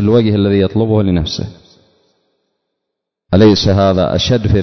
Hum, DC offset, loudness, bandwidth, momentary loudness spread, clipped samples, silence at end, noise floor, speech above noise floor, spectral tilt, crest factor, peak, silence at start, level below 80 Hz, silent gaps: none; under 0.1%; -12 LUFS; 6.4 kHz; 9 LU; under 0.1%; 0 s; -77 dBFS; 66 dB; -7 dB/octave; 14 dB; 0 dBFS; 0 s; -30 dBFS; none